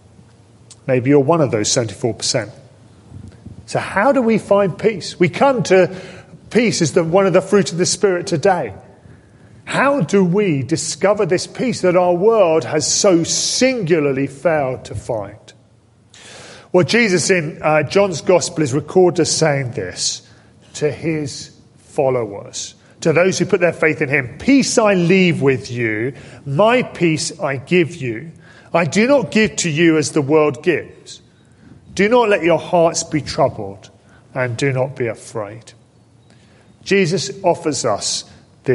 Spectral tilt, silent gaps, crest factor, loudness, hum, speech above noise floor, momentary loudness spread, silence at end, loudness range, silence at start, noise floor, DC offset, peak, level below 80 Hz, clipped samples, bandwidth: -4.5 dB/octave; none; 16 dB; -16 LUFS; none; 35 dB; 14 LU; 0 s; 6 LU; 0.7 s; -51 dBFS; under 0.1%; -2 dBFS; -50 dBFS; under 0.1%; 11.5 kHz